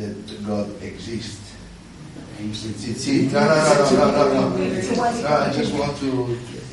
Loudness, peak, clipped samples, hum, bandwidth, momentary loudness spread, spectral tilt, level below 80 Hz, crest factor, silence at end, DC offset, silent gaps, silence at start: -20 LUFS; -2 dBFS; under 0.1%; none; 11.5 kHz; 22 LU; -5.5 dB/octave; -48 dBFS; 18 dB; 0 s; under 0.1%; none; 0 s